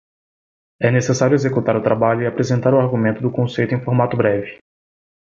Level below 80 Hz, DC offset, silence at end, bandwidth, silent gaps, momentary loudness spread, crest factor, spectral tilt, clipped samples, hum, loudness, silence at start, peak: -54 dBFS; under 0.1%; 0.85 s; 7.6 kHz; none; 5 LU; 16 dB; -7 dB/octave; under 0.1%; none; -18 LUFS; 0.8 s; -2 dBFS